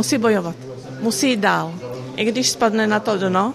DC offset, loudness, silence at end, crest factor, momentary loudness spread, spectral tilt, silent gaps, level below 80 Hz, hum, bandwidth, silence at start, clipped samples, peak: under 0.1%; -19 LUFS; 0 s; 16 dB; 13 LU; -4 dB/octave; none; -58 dBFS; none; 15 kHz; 0 s; under 0.1%; -2 dBFS